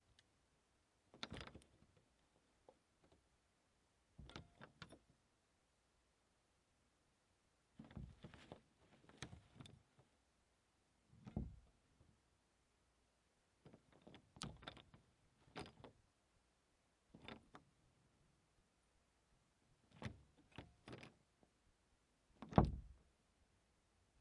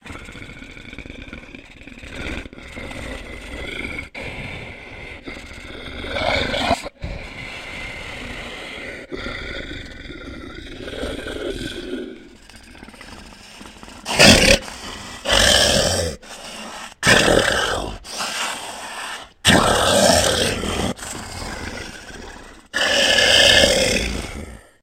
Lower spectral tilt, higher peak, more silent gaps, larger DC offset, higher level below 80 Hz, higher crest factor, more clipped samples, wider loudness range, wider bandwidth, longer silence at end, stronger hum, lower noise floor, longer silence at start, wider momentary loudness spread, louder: first, -6.5 dB/octave vs -2.5 dB/octave; second, -14 dBFS vs 0 dBFS; neither; neither; second, -64 dBFS vs -36 dBFS; first, 40 dB vs 22 dB; neither; first, 20 LU vs 16 LU; second, 10.5 kHz vs 16 kHz; first, 1.25 s vs 0.2 s; neither; first, -82 dBFS vs -43 dBFS; first, 1.15 s vs 0.05 s; second, 18 LU vs 24 LU; second, -50 LUFS vs -17 LUFS